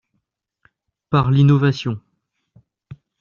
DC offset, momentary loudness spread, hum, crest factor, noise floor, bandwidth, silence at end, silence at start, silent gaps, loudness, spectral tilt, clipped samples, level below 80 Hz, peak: under 0.1%; 13 LU; none; 18 dB; -74 dBFS; 7 kHz; 0.25 s; 1.1 s; none; -17 LUFS; -7 dB/octave; under 0.1%; -50 dBFS; -4 dBFS